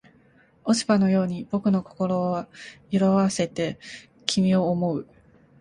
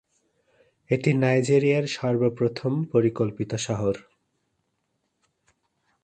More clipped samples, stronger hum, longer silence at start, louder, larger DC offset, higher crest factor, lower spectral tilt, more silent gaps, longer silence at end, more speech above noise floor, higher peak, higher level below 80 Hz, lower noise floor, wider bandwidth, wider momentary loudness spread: neither; neither; second, 0.65 s vs 0.9 s; about the same, -24 LUFS vs -24 LUFS; neither; first, 24 dB vs 18 dB; about the same, -6 dB/octave vs -6.5 dB/octave; neither; second, 0.6 s vs 2.05 s; second, 34 dB vs 52 dB; first, -2 dBFS vs -8 dBFS; about the same, -60 dBFS vs -60 dBFS; second, -58 dBFS vs -75 dBFS; first, 11 kHz vs 9.4 kHz; first, 13 LU vs 8 LU